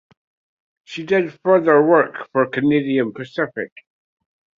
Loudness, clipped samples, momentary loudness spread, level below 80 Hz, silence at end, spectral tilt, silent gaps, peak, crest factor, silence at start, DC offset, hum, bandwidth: -18 LUFS; under 0.1%; 17 LU; -64 dBFS; 0.95 s; -7.5 dB/octave; none; -2 dBFS; 18 dB; 0.9 s; under 0.1%; none; 7.4 kHz